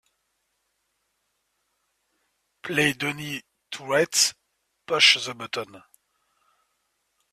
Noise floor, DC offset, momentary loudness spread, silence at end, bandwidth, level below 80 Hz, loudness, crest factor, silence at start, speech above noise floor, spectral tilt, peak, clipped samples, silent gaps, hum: -75 dBFS; under 0.1%; 21 LU; 1.55 s; 15.5 kHz; -68 dBFS; -22 LUFS; 24 dB; 2.65 s; 51 dB; -1.5 dB/octave; -4 dBFS; under 0.1%; none; none